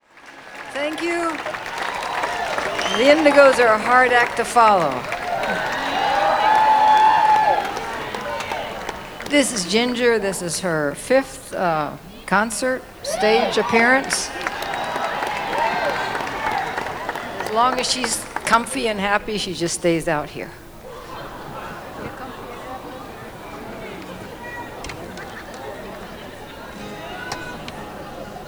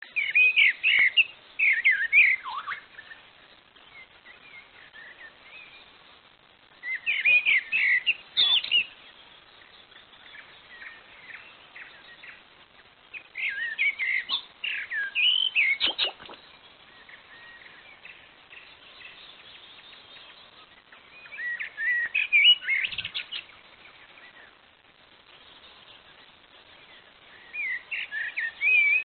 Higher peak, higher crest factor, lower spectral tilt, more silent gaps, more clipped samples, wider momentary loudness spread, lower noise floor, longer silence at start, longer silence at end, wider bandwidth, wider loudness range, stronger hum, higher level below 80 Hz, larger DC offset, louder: first, 0 dBFS vs -10 dBFS; about the same, 20 dB vs 20 dB; first, -3 dB/octave vs 5 dB/octave; neither; neither; second, 20 LU vs 28 LU; second, -42 dBFS vs -57 dBFS; about the same, 0.15 s vs 0.15 s; about the same, 0 s vs 0 s; first, over 20 kHz vs 4.6 kHz; second, 17 LU vs 23 LU; neither; first, -48 dBFS vs -72 dBFS; neither; first, -19 LUFS vs -22 LUFS